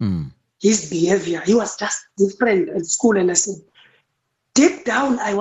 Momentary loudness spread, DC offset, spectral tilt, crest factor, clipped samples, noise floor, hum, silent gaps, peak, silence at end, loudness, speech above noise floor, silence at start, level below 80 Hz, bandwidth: 8 LU; under 0.1%; -4 dB/octave; 18 dB; under 0.1%; -73 dBFS; none; none; -2 dBFS; 0 s; -19 LUFS; 55 dB; 0 s; -54 dBFS; 8.4 kHz